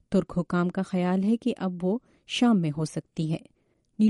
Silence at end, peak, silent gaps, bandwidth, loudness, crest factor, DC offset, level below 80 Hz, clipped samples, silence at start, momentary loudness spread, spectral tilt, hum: 0 s; -12 dBFS; none; 11.5 kHz; -27 LUFS; 14 dB; under 0.1%; -58 dBFS; under 0.1%; 0.1 s; 9 LU; -7 dB/octave; none